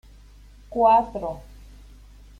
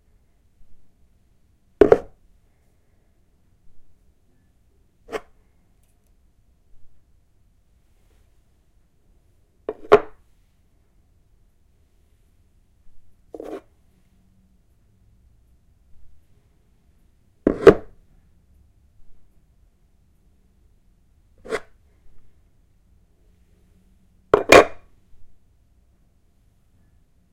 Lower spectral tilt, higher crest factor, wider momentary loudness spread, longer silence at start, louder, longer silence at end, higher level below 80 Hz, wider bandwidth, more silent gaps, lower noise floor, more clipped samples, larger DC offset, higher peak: first, -7 dB/octave vs -4.5 dB/octave; second, 20 dB vs 26 dB; second, 16 LU vs 25 LU; about the same, 0.7 s vs 0.7 s; second, -22 LUFS vs -18 LUFS; second, 1 s vs 2.05 s; about the same, -46 dBFS vs -48 dBFS; second, 10 kHz vs 16 kHz; neither; second, -48 dBFS vs -59 dBFS; neither; neither; second, -6 dBFS vs 0 dBFS